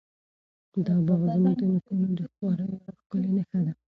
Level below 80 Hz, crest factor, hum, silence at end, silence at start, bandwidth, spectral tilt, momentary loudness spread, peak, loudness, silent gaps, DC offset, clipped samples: -62 dBFS; 14 dB; none; 0.15 s; 0.75 s; 4.6 kHz; -12 dB/octave; 10 LU; -12 dBFS; -27 LUFS; 3.06-3.10 s; under 0.1%; under 0.1%